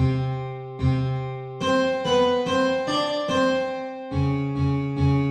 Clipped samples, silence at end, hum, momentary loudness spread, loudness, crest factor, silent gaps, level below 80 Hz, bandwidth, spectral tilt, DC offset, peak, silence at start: under 0.1%; 0 s; none; 8 LU; -24 LUFS; 14 dB; none; -42 dBFS; 10 kHz; -6.5 dB/octave; under 0.1%; -10 dBFS; 0 s